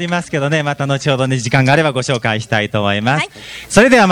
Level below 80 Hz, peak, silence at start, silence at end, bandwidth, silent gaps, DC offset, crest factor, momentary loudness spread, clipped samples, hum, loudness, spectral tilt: -44 dBFS; 0 dBFS; 0 s; 0 s; 15.5 kHz; none; under 0.1%; 14 dB; 7 LU; 0.1%; none; -14 LUFS; -5 dB/octave